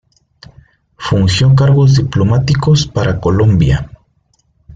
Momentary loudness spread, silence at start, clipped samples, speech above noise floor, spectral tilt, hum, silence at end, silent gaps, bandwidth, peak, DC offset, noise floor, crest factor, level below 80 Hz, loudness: 8 LU; 1 s; under 0.1%; 48 dB; -6.5 dB/octave; none; 0.9 s; none; 7.8 kHz; -2 dBFS; under 0.1%; -58 dBFS; 12 dB; -32 dBFS; -11 LUFS